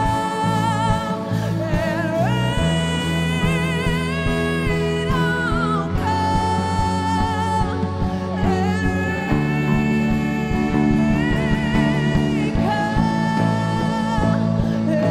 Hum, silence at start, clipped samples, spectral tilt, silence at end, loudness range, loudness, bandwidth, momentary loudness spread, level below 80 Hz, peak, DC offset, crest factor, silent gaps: none; 0 s; under 0.1%; -6.5 dB/octave; 0 s; 2 LU; -20 LUFS; 14.5 kHz; 3 LU; -32 dBFS; -6 dBFS; under 0.1%; 12 dB; none